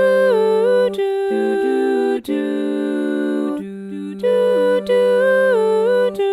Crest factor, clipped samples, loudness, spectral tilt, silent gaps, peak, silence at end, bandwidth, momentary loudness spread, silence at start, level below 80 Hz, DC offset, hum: 12 dB; under 0.1%; -17 LUFS; -6 dB/octave; none; -4 dBFS; 0 s; 13 kHz; 8 LU; 0 s; -62 dBFS; under 0.1%; none